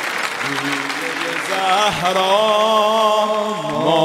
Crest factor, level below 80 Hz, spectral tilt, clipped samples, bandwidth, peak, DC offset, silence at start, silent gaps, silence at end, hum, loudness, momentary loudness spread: 16 dB; -56 dBFS; -3 dB/octave; under 0.1%; 16 kHz; -2 dBFS; under 0.1%; 0 s; none; 0 s; none; -17 LUFS; 7 LU